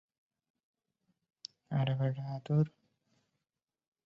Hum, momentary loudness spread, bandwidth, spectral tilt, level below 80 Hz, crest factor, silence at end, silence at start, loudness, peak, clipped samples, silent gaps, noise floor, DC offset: none; 18 LU; 7 kHz; -8.5 dB/octave; -74 dBFS; 20 dB; 1.4 s; 1.7 s; -34 LUFS; -18 dBFS; under 0.1%; none; under -90 dBFS; under 0.1%